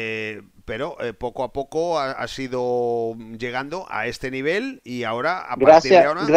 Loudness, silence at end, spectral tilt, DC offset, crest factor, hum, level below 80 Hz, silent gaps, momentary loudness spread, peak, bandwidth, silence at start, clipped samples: -21 LUFS; 0 s; -5 dB/octave; under 0.1%; 20 dB; none; -52 dBFS; none; 16 LU; 0 dBFS; 12 kHz; 0 s; under 0.1%